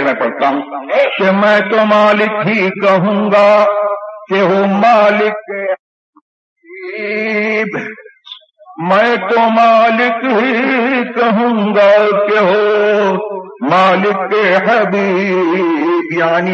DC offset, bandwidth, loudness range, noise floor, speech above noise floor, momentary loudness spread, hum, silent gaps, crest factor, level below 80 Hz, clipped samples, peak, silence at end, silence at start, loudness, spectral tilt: under 0.1%; 7.6 kHz; 6 LU; -37 dBFS; 25 dB; 11 LU; none; 5.79-6.13 s, 6.21-6.56 s; 12 dB; -66 dBFS; under 0.1%; 0 dBFS; 0 s; 0 s; -12 LUFS; -6.5 dB/octave